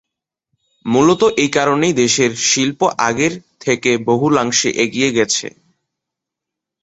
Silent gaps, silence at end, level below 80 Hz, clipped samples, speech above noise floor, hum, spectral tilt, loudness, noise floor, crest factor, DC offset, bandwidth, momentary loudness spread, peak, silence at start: none; 1.35 s; -54 dBFS; under 0.1%; 67 dB; none; -3.5 dB/octave; -15 LUFS; -83 dBFS; 16 dB; under 0.1%; 8.2 kHz; 6 LU; 0 dBFS; 0.85 s